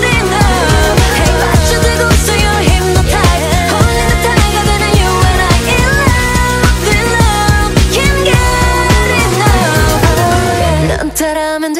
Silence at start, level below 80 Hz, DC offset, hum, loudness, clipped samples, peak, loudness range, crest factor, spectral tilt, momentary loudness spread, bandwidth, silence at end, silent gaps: 0 s; -16 dBFS; under 0.1%; none; -10 LUFS; under 0.1%; 0 dBFS; 0 LU; 10 dB; -4.5 dB/octave; 2 LU; 16.5 kHz; 0 s; none